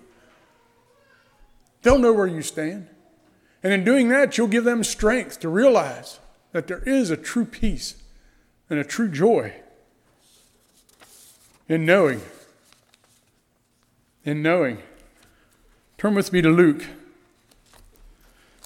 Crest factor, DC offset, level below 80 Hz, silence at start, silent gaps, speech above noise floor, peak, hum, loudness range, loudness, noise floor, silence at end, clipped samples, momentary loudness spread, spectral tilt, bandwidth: 20 dB; under 0.1%; -42 dBFS; 1.85 s; none; 46 dB; -4 dBFS; none; 7 LU; -21 LUFS; -66 dBFS; 1.7 s; under 0.1%; 14 LU; -5.5 dB/octave; 16.5 kHz